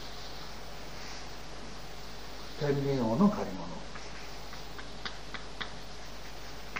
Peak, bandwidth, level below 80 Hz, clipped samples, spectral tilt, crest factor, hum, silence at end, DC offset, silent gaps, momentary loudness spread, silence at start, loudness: -14 dBFS; 15.5 kHz; -50 dBFS; under 0.1%; -5.5 dB/octave; 22 dB; none; 0 s; 0.9%; none; 16 LU; 0 s; -37 LUFS